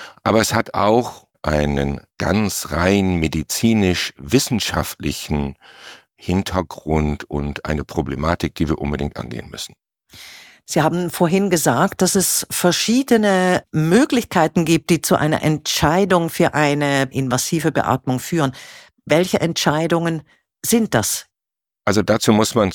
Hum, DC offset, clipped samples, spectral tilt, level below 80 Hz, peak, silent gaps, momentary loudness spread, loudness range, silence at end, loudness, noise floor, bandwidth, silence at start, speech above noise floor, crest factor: none; under 0.1%; under 0.1%; -4.5 dB/octave; -38 dBFS; -2 dBFS; none; 10 LU; 7 LU; 0 s; -18 LUFS; -87 dBFS; 19 kHz; 0 s; 69 dB; 16 dB